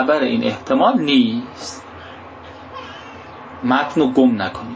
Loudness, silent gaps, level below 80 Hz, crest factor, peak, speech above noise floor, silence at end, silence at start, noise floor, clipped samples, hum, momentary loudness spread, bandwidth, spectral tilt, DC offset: -17 LUFS; none; -52 dBFS; 16 dB; -2 dBFS; 20 dB; 0 s; 0 s; -37 dBFS; under 0.1%; none; 21 LU; 8 kHz; -5.5 dB/octave; under 0.1%